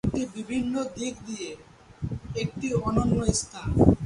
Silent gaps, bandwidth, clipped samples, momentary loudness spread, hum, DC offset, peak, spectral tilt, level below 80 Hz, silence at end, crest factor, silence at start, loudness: none; 11.5 kHz; under 0.1%; 13 LU; none; under 0.1%; -2 dBFS; -6 dB/octave; -38 dBFS; 0 s; 24 dB; 0.05 s; -28 LUFS